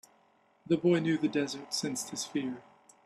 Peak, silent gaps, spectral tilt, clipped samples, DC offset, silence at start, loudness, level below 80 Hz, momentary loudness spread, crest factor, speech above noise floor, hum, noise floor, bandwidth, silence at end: -14 dBFS; none; -4.5 dB/octave; under 0.1%; under 0.1%; 0.7 s; -31 LUFS; -74 dBFS; 9 LU; 18 dB; 36 dB; none; -67 dBFS; 13 kHz; 0.45 s